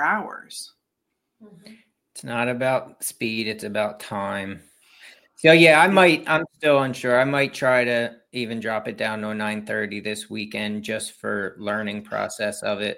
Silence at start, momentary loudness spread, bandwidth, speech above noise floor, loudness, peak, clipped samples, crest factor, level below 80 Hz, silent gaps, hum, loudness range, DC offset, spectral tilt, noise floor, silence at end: 0 s; 15 LU; 16.5 kHz; 56 dB; -22 LUFS; -2 dBFS; under 0.1%; 22 dB; -68 dBFS; none; none; 10 LU; under 0.1%; -4.5 dB/octave; -78 dBFS; 0 s